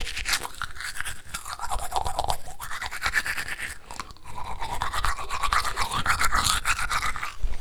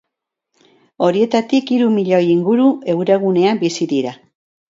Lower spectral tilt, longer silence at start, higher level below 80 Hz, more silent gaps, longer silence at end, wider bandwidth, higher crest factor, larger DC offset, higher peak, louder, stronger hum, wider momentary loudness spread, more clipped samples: second, -1.5 dB/octave vs -6.5 dB/octave; second, 0 s vs 1 s; first, -36 dBFS vs -64 dBFS; neither; second, 0 s vs 0.55 s; first, 19.5 kHz vs 7.8 kHz; first, 24 dB vs 16 dB; neither; about the same, -2 dBFS vs -2 dBFS; second, -28 LUFS vs -15 LUFS; neither; first, 13 LU vs 5 LU; neither